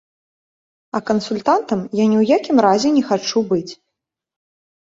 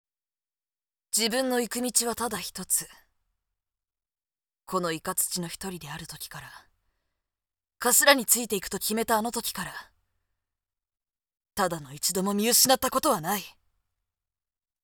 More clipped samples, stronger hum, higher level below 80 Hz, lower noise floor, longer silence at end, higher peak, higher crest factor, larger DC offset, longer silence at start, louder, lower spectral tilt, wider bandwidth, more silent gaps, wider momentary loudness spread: neither; neither; about the same, -60 dBFS vs -62 dBFS; second, -80 dBFS vs under -90 dBFS; second, 1.2 s vs 1.35 s; about the same, -2 dBFS vs -4 dBFS; second, 16 dB vs 26 dB; neither; second, 0.95 s vs 1.15 s; first, -17 LUFS vs -25 LUFS; first, -5.5 dB/octave vs -2 dB/octave; second, 7.8 kHz vs over 20 kHz; neither; second, 8 LU vs 19 LU